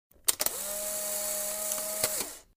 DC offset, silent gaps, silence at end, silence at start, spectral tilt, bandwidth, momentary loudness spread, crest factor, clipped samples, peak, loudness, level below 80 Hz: under 0.1%; none; 0.15 s; 0.25 s; 0.5 dB/octave; 16 kHz; 4 LU; 28 dB; under 0.1%; -6 dBFS; -30 LUFS; -62 dBFS